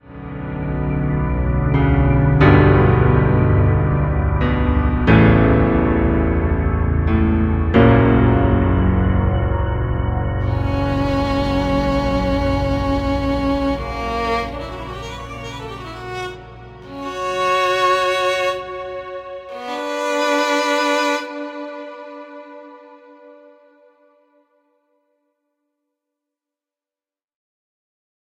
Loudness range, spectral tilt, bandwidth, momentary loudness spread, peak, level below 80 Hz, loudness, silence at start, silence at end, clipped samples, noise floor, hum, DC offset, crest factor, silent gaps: 9 LU; -7 dB/octave; 12 kHz; 17 LU; 0 dBFS; -26 dBFS; -17 LUFS; 0.1 s; 5.1 s; under 0.1%; under -90 dBFS; none; under 0.1%; 18 dB; none